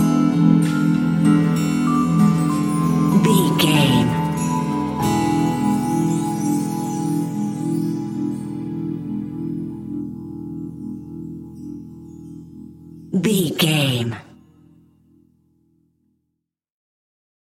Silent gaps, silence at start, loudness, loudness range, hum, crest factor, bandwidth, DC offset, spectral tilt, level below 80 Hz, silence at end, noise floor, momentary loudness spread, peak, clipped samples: none; 0 s; -19 LUFS; 13 LU; none; 18 dB; 17 kHz; under 0.1%; -6 dB/octave; -50 dBFS; 3.25 s; -77 dBFS; 19 LU; -2 dBFS; under 0.1%